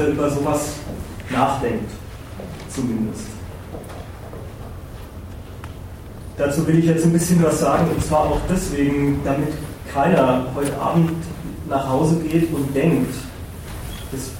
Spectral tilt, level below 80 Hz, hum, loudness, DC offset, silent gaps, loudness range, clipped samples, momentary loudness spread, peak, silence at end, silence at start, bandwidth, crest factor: -6.5 dB/octave; -38 dBFS; none; -20 LUFS; under 0.1%; none; 12 LU; under 0.1%; 19 LU; -4 dBFS; 0 s; 0 s; 16.5 kHz; 18 dB